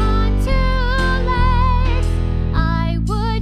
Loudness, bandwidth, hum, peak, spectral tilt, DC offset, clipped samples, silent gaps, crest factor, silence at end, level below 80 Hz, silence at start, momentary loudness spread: -18 LUFS; 9.6 kHz; none; -4 dBFS; -7 dB/octave; under 0.1%; under 0.1%; none; 12 dB; 0 s; -18 dBFS; 0 s; 4 LU